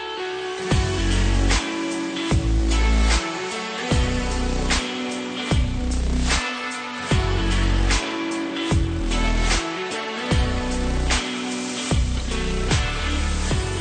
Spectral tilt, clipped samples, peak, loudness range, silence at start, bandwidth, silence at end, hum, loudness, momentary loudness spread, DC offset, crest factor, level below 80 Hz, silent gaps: -4.5 dB/octave; under 0.1%; -8 dBFS; 2 LU; 0 s; 9.4 kHz; 0 s; none; -23 LUFS; 6 LU; under 0.1%; 14 dB; -24 dBFS; none